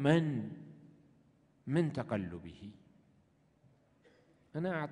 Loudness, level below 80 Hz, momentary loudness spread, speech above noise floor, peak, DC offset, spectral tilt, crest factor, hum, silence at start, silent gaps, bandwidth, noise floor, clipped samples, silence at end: -36 LUFS; -70 dBFS; 21 LU; 36 dB; -16 dBFS; under 0.1%; -8 dB/octave; 22 dB; none; 0 s; none; 10 kHz; -70 dBFS; under 0.1%; 0 s